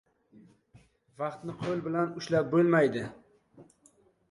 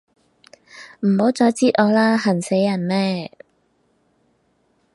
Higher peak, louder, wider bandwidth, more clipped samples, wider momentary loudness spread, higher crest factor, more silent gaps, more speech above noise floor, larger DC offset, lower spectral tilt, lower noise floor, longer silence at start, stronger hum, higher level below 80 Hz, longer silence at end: second, -12 dBFS vs -2 dBFS; second, -29 LUFS vs -18 LUFS; about the same, 11 kHz vs 11.5 kHz; neither; about the same, 13 LU vs 15 LU; about the same, 20 dB vs 20 dB; neither; second, 36 dB vs 47 dB; neither; about the same, -7 dB/octave vs -6 dB/octave; about the same, -65 dBFS vs -64 dBFS; first, 1.2 s vs 0.75 s; neither; about the same, -68 dBFS vs -68 dBFS; second, 0.65 s vs 1.65 s